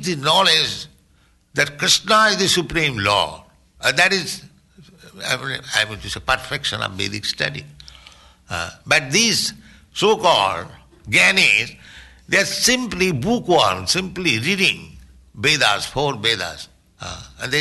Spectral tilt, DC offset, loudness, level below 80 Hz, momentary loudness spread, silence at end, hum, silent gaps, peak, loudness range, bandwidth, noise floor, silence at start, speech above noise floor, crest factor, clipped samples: -2.5 dB/octave; under 0.1%; -17 LUFS; -48 dBFS; 16 LU; 0 s; none; none; -2 dBFS; 6 LU; 12.5 kHz; -57 dBFS; 0 s; 38 dB; 18 dB; under 0.1%